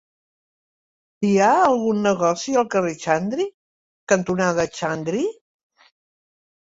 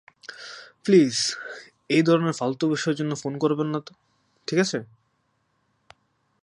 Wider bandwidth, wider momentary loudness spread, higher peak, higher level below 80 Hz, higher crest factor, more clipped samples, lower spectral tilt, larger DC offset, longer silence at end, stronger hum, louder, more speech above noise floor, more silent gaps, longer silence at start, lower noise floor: second, 8 kHz vs 11.5 kHz; second, 9 LU vs 20 LU; about the same, -4 dBFS vs -6 dBFS; first, -60 dBFS vs -74 dBFS; about the same, 20 dB vs 20 dB; neither; about the same, -5 dB/octave vs -5 dB/octave; neither; about the same, 1.45 s vs 1.55 s; neither; about the same, -21 LUFS vs -23 LUFS; first, over 70 dB vs 48 dB; first, 3.54-4.07 s vs none; first, 1.2 s vs 0.3 s; first, under -90 dBFS vs -71 dBFS